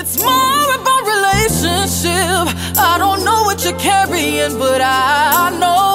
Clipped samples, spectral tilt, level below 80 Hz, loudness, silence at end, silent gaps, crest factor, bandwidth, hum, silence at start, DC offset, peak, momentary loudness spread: under 0.1%; -3 dB/octave; -36 dBFS; -13 LUFS; 0 s; none; 14 dB; 16.5 kHz; none; 0 s; under 0.1%; 0 dBFS; 3 LU